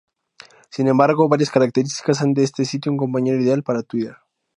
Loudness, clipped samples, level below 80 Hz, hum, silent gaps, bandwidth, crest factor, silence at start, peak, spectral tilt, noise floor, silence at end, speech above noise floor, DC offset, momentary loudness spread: -19 LUFS; under 0.1%; -66 dBFS; none; none; 11 kHz; 18 dB; 0.75 s; 0 dBFS; -6.5 dB/octave; -48 dBFS; 0.4 s; 30 dB; under 0.1%; 9 LU